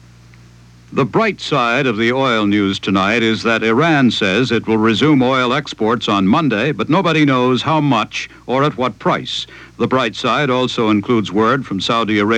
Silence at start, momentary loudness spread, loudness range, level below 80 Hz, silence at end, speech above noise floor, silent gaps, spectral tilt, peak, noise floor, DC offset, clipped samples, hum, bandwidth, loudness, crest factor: 0.9 s; 6 LU; 3 LU; -50 dBFS; 0 s; 28 dB; none; -5.5 dB/octave; -2 dBFS; -43 dBFS; under 0.1%; under 0.1%; none; 9.8 kHz; -15 LUFS; 12 dB